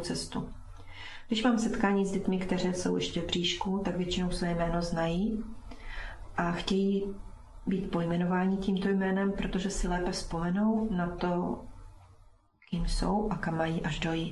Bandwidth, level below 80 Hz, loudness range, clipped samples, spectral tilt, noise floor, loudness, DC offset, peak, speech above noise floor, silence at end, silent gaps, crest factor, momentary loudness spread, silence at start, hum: 12 kHz; -44 dBFS; 3 LU; under 0.1%; -5.5 dB/octave; -60 dBFS; -31 LUFS; under 0.1%; -14 dBFS; 30 dB; 0 s; none; 18 dB; 14 LU; 0 s; none